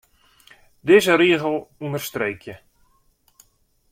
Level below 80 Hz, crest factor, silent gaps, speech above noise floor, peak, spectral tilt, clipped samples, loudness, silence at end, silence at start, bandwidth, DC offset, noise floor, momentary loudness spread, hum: -60 dBFS; 20 dB; none; 44 dB; -2 dBFS; -5 dB/octave; under 0.1%; -19 LUFS; 1.35 s; 0.85 s; 16 kHz; under 0.1%; -63 dBFS; 17 LU; none